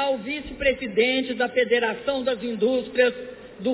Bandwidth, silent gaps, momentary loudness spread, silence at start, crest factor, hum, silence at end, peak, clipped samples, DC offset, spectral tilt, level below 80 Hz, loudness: 4 kHz; none; 9 LU; 0 s; 16 dB; none; 0 s; -8 dBFS; under 0.1%; under 0.1%; -8 dB/octave; -50 dBFS; -23 LUFS